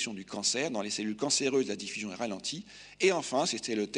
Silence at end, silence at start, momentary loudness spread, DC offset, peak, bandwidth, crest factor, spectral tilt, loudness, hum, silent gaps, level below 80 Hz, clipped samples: 0 s; 0 s; 9 LU; under 0.1%; -12 dBFS; 10 kHz; 20 dB; -2.5 dB/octave; -31 LUFS; none; none; -70 dBFS; under 0.1%